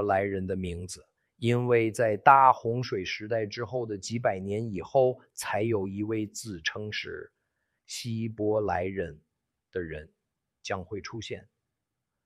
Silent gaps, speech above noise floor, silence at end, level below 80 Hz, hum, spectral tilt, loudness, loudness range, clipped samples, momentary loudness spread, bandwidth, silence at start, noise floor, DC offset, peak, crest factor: none; 57 dB; 0.85 s; -58 dBFS; none; -5.5 dB/octave; -28 LUFS; 9 LU; under 0.1%; 16 LU; 14.5 kHz; 0 s; -85 dBFS; under 0.1%; -4 dBFS; 24 dB